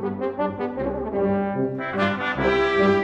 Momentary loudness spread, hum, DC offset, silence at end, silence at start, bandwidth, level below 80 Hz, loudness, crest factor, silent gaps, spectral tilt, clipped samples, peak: 8 LU; none; under 0.1%; 0 s; 0 s; 8 kHz; -46 dBFS; -23 LUFS; 16 dB; none; -7 dB/octave; under 0.1%; -8 dBFS